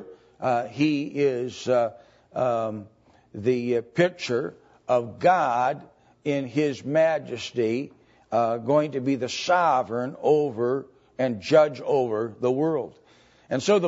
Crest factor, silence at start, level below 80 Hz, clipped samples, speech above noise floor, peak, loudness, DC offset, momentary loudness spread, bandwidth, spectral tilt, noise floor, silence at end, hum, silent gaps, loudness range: 18 dB; 0 s; -68 dBFS; under 0.1%; 33 dB; -6 dBFS; -25 LUFS; under 0.1%; 10 LU; 8 kHz; -6 dB/octave; -56 dBFS; 0 s; none; none; 3 LU